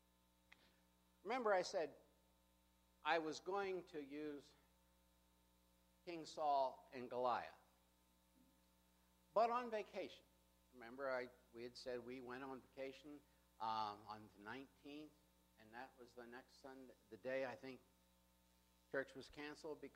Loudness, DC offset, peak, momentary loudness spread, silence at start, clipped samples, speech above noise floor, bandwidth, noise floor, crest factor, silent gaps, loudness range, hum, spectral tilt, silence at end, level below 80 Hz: -47 LUFS; under 0.1%; -26 dBFS; 19 LU; 1.25 s; under 0.1%; 31 dB; 15.5 kHz; -78 dBFS; 24 dB; none; 8 LU; 60 Hz at -80 dBFS; -4 dB/octave; 0.05 s; -82 dBFS